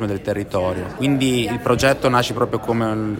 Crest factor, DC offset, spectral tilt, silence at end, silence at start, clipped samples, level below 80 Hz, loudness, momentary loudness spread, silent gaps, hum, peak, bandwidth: 18 dB; under 0.1%; -5.5 dB/octave; 0 s; 0 s; under 0.1%; -44 dBFS; -19 LUFS; 6 LU; none; none; -2 dBFS; 16.5 kHz